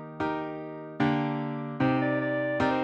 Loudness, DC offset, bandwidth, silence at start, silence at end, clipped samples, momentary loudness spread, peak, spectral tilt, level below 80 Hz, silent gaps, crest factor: -29 LUFS; under 0.1%; 7.8 kHz; 0 s; 0 s; under 0.1%; 9 LU; -14 dBFS; -8 dB/octave; -60 dBFS; none; 14 dB